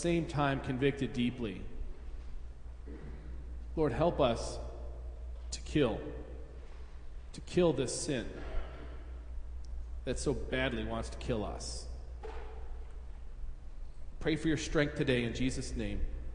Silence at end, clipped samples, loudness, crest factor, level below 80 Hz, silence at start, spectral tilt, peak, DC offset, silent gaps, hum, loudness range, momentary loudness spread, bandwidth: 0 s; under 0.1%; -35 LUFS; 20 dB; -42 dBFS; 0 s; -5.5 dB/octave; -14 dBFS; under 0.1%; none; none; 4 LU; 19 LU; 10.5 kHz